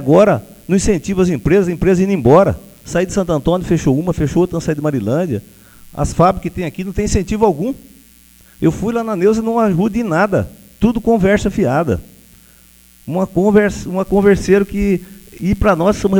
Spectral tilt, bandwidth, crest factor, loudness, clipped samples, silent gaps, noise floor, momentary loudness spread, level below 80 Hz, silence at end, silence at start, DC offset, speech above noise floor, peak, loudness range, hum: -7 dB/octave; 20 kHz; 14 dB; -15 LUFS; under 0.1%; none; -46 dBFS; 9 LU; -32 dBFS; 0 s; 0 s; under 0.1%; 32 dB; 0 dBFS; 3 LU; none